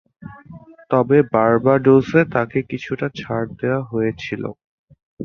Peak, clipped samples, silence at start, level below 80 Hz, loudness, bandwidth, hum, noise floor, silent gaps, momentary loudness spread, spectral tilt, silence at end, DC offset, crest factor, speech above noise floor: -2 dBFS; under 0.1%; 0.2 s; -52 dBFS; -18 LUFS; 6.8 kHz; none; -42 dBFS; 4.64-4.88 s, 5.03-5.17 s; 13 LU; -8.5 dB/octave; 0 s; under 0.1%; 18 dB; 24 dB